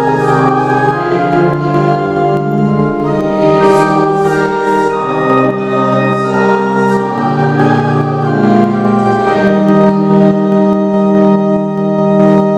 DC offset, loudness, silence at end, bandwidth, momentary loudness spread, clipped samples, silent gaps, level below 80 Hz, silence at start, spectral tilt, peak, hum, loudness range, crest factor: under 0.1%; -10 LUFS; 0 s; 11 kHz; 4 LU; 0.2%; none; -44 dBFS; 0 s; -8 dB/octave; 0 dBFS; none; 2 LU; 10 dB